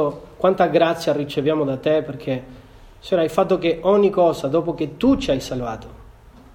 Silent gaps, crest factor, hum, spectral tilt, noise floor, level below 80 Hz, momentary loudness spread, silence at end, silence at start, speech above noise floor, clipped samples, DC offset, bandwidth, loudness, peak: none; 16 dB; none; -6.5 dB/octave; -45 dBFS; -44 dBFS; 11 LU; 0.45 s; 0 s; 26 dB; under 0.1%; under 0.1%; 17 kHz; -20 LUFS; -4 dBFS